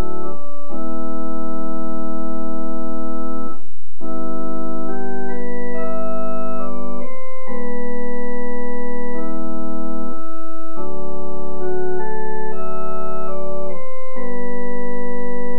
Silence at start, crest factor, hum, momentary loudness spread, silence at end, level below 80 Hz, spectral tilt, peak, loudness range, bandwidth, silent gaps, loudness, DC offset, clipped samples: 0 s; 12 dB; none; 5 LU; 0 s; -56 dBFS; -12 dB/octave; -4 dBFS; 1 LU; 4.3 kHz; none; -28 LUFS; 40%; under 0.1%